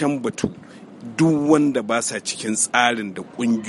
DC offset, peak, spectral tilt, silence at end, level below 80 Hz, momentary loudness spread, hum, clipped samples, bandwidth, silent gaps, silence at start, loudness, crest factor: under 0.1%; 0 dBFS; -4 dB/octave; 0 s; -58 dBFS; 14 LU; none; under 0.1%; 11.5 kHz; none; 0 s; -20 LUFS; 20 dB